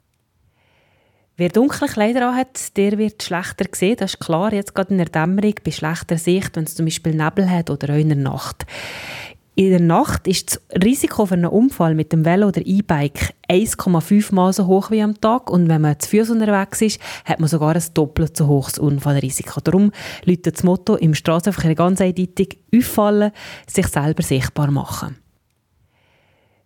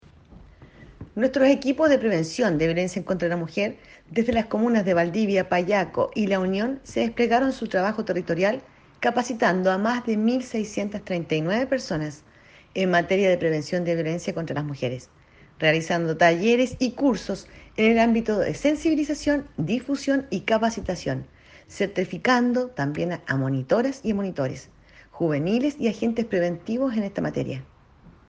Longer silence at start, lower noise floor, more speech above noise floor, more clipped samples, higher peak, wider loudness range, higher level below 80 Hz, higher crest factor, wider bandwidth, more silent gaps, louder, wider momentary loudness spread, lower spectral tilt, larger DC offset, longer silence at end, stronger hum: first, 1.4 s vs 0.3 s; first, -64 dBFS vs -52 dBFS; first, 46 dB vs 29 dB; neither; first, 0 dBFS vs -6 dBFS; about the same, 3 LU vs 3 LU; first, -44 dBFS vs -54 dBFS; about the same, 18 dB vs 18 dB; first, 18 kHz vs 9.4 kHz; neither; first, -18 LUFS vs -24 LUFS; about the same, 7 LU vs 9 LU; about the same, -6 dB/octave vs -6 dB/octave; neither; first, 1.5 s vs 0.2 s; neither